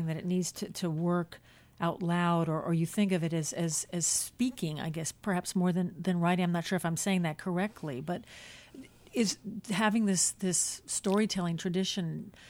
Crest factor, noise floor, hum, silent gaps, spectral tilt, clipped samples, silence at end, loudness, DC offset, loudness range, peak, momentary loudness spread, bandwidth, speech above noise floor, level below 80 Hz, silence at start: 18 dB; -52 dBFS; none; none; -4.5 dB/octave; under 0.1%; 0 s; -31 LUFS; under 0.1%; 3 LU; -14 dBFS; 9 LU; 16.5 kHz; 21 dB; -66 dBFS; 0 s